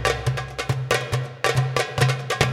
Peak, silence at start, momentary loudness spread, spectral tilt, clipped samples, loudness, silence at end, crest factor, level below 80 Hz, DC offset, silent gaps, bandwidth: -2 dBFS; 0 s; 6 LU; -4.5 dB/octave; under 0.1%; -23 LUFS; 0 s; 20 dB; -42 dBFS; under 0.1%; none; 15 kHz